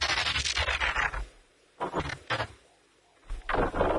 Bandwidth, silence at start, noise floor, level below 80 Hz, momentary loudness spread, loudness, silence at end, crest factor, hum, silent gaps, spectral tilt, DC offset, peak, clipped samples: 11.5 kHz; 0 s; -63 dBFS; -40 dBFS; 15 LU; -29 LUFS; 0 s; 20 dB; none; none; -3 dB/octave; under 0.1%; -12 dBFS; under 0.1%